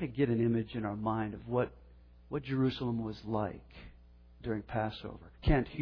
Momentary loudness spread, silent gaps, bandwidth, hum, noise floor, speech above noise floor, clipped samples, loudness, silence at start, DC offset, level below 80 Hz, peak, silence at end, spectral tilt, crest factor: 14 LU; none; 5.4 kHz; 60 Hz at -55 dBFS; -57 dBFS; 24 dB; under 0.1%; -35 LUFS; 0 s; under 0.1%; -46 dBFS; -14 dBFS; 0 s; -9.5 dB/octave; 20 dB